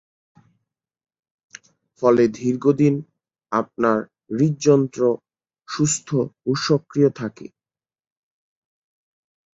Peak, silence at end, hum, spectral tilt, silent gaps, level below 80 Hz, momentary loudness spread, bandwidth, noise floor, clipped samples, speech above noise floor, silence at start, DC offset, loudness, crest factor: -4 dBFS; 2.1 s; none; -6 dB/octave; none; -64 dBFS; 11 LU; 8 kHz; under -90 dBFS; under 0.1%; over 71 dB; 2 s; under 0.1%; -20 LUFS; 20 dB